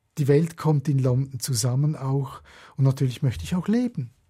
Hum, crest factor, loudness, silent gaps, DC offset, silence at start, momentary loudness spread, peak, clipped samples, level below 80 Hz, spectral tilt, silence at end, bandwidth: none; 16 dB; -24 LUFS; none; under 0.1%; 0.15 s; 7 LU; -8 dBFS; under 0.1%; -52 dBFS; -6.5 dB/octave; 0.2 s; 15.5 kHz